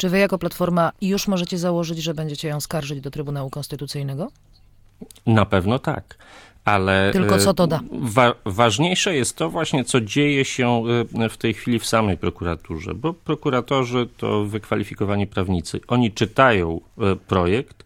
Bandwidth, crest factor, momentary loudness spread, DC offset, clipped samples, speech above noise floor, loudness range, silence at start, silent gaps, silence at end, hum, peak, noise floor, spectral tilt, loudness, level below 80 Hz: 19 kHz; 20 dB; 11 LU; under 0.1%; under 0.1%; 30 dB; 6 LU; 0 s; none; 0.2 s; none; 0 dBFS; -51 dBFS; -5 dB/octave; -21 LUFS; -46 dBFS